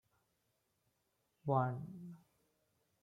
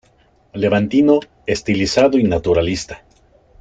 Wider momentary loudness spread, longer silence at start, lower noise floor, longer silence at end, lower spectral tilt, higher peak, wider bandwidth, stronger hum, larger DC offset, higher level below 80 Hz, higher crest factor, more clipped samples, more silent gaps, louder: first, 18 LU vs 14 LU; first, 1.45 s vs 0.55 s; first, -82 dBFS vs -55 dBFS; first, 0.85 s vs 0.65 s; first, -10 dB/octave vs -5.5 dB/octave; second, -20 dBFS vs -2 dBFS; second, 3.9 kHz vs 9.2 kHz; neither; neither; second, -82 dBFS vs -42 dBFS; first, 24 dB vs 16 dB; neither; neither; second, -39 LUFS vs -16 LUFS